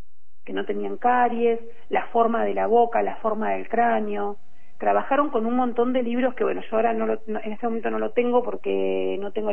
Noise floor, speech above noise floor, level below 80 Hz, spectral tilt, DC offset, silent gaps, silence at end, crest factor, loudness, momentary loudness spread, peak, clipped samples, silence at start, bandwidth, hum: -48 dBFS; 25 dB; -62 dBFS; -8.5 dB/octave; 4%; none; 0 s; 16 dB; -24 LUFS; 8 LU; -6 dBFS; under 0.1%; 0.45 s; 3.5 kHz; none